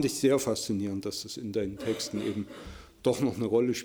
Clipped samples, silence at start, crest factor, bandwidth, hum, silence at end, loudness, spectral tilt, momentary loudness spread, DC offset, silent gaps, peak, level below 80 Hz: under 0.1%; 0 s; 18 dB; over 20 kHz; none; 0 s; -30 LUFS; -5 dB/octave; 11 LU; under 0.1%; none; -12 dBFS; -58 dBFS